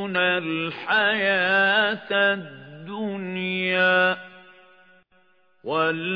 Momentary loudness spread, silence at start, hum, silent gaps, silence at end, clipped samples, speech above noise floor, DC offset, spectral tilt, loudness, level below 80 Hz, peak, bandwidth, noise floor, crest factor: 13 LU; 0 s; none; none; 0 s; under 0.1%; 40 dB; under 0.1%; -7 dB/octave; -22 LUFS; -76 dBFS; -8 dBFS; 5.4 kHz; -63 dBFS; 16 dB